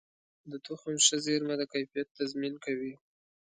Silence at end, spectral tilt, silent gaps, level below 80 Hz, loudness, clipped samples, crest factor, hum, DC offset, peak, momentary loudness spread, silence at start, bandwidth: 0.45 s; -2 dB/octave; 2.11-2.15 s; -78 dBFS; -31 LUFS; under 0.1%; 26 dB; none; under 0.1%; -8 dBFS; 17 LU; 0.45 s; 9.6 kHz